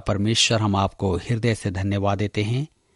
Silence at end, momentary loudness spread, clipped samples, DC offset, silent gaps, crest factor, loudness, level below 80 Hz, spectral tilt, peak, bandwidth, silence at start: 0.3 s; 7 LU; under 0.1%; under 0.1%; none; 16 dB; -22 LUFS; -46 dBFS; -4.5 dB/octave; -6 dBFS; 11.5 kHz; 0 s